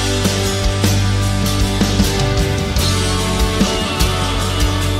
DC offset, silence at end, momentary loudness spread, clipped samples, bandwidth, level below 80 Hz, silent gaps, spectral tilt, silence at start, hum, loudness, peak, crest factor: under 0.1%; 0 s; 2 LU; under 0.1%; 16.5 kHz; -22 dBFS; none; -4.5 dB/octave; 0 s; none; -16 LUFS; -2 dBFS; 14 dB